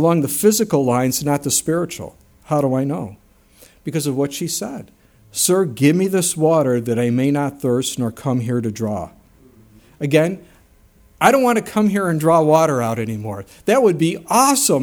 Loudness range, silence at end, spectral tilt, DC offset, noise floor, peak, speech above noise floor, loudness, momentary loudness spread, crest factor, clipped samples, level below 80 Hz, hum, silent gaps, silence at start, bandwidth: 6 LU; 0 s; -5 dB/octave; under 0.1%; -51 dBFS; 0 dBFS; 34 dB; -18 LUFS; 13 LU; 18 dB; under 0.1%; -54 dBFS; none; none; 0 s; over 20 kHz